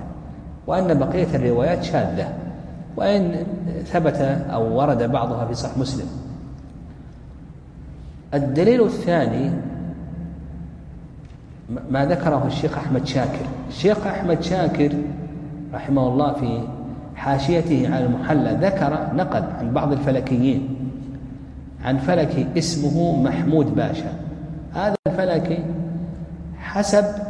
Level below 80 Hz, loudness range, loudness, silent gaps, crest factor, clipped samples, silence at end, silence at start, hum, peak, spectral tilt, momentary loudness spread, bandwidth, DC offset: -40 dBFS; 4 LU; -21 LUFS; 24.99-25.03 s; 18 dB; under 0.1%; 0 s; 0 s; none; -4 dBFS; -7 dB/octave; 18 LU; 11 kHz; under 0.1%